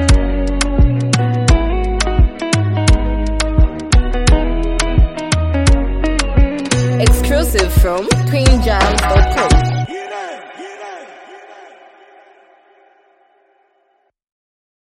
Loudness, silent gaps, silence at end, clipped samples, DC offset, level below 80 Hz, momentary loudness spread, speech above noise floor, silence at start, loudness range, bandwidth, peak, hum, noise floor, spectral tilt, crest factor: -15 LUFS; none; 3.15 s; under 0.1%; under 0.1%; -16 dBFS; 12 LU; 50 dB; 0 s; 7 LU; 16 kHz; 0 dBFS; none; -61 dBFS; -5 dB/octave; 14 dB